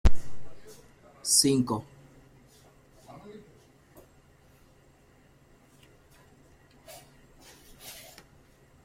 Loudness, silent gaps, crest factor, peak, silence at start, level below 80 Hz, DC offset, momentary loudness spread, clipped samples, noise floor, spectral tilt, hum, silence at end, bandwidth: -25 LUFS; none; 22 dB; -8 dBFS; 0.05 s; -40 dBFS; under 0.1%; 31 LU; under 0.1%; -60 dBFS; -3.5 dB/octave; none; 0.95 s; 15.5 kHz